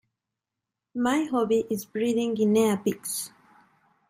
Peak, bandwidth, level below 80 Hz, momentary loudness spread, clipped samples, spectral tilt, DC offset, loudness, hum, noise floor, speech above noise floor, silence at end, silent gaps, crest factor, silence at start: -12 dBFS; 16 kHz; -68 dBFS; 10 LU; under 0.1%; -5 dB/octave; under 0.1%; -26 LUFS; none; -87 dBFS; 62 dB; 0.8 s; none; 16 dB; 0.95 s